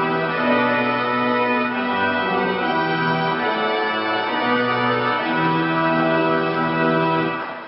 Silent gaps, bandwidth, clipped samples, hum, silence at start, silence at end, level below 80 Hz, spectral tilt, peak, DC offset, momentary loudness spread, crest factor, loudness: none; 5.8 kHz; under 0.1%; none; 0 s; 0 s; -60 dBFS; -10.5 dB/octave; -6 dBFS; under 0.1%; 2 LU; 14 dB; -19 LUFS